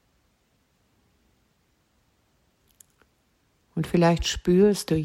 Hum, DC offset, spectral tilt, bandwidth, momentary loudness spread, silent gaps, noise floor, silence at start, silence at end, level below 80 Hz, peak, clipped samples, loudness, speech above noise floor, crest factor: none; under 0.1%; -6 dB/octave; 15.5 kHz; 11 LU; none; -68 dBFS; 3.75 s; 0 s; -46 dBFS; -8 dBFS; under 0.1%; -22 LUFS; 47 dB; 20 dB